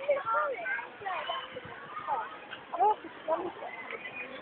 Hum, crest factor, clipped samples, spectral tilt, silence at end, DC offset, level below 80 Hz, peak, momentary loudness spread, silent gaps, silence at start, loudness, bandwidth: none; 18 dB; under 0.1%; -0.5 dB/octave; 0 s; under 0.1%; -76 dBFS; -16 dBFS; 13 LU; none; 0 s; -34 LUFS; 4.4 kHz